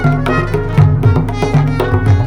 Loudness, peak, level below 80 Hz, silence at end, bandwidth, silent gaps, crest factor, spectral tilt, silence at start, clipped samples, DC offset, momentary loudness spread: -13 LUFS; 0 dBFS; -24 dBFS; 0 s; 10.5 kHz; none; 12 dB; -8 dB/octave; 0 s; under 0.1%; under 0.1%; 4 LU